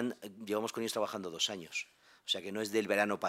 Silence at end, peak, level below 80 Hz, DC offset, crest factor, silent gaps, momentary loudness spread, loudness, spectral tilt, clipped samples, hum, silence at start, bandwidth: 0 s; -16 dBFS; -84 dBFS; under 0.1%; 20 dB; none; 10 LU; -35 LUFS; -3 dB/octave; under 0.1%; none; 0 s; 16 kHz